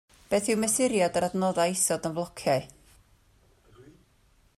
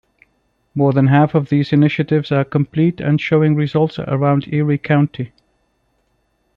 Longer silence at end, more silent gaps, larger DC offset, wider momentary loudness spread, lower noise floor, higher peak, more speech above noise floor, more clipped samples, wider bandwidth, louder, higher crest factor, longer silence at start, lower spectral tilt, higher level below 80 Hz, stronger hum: second, 0.75 s vs 1.3 s; neither; neither; about the same, 6 LU vs 5 LU; about the same, -63 dBFS vs -64 dBFS; second, -12 dBFS vs -2 dBFS; second, 37 dB vs 49 dB; neither; first, 15.5 kHz vs 5.6 kHz; second, -26 LUFS vs -16 LUFS; about the same, 16 dB vs 14 dB; second, 0.3 s vs 0.75 s; second, -4 dB/octave vs -9.5 dB/octave; second, -62 dBFS vs -54 dBFS; neither